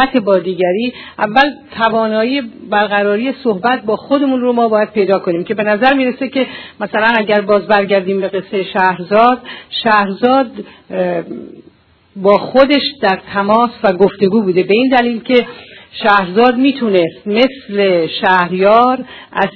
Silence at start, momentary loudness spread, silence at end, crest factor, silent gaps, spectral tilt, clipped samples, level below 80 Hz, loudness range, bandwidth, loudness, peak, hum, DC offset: 0 s; 8 LU; 0.05 s; 14 dB; none; -7.5 dB/octave; 0.2%; -52 dBFS; 2 LU; 6 kHz; -13 LUFS; 0 dBFS; none; under 0.1%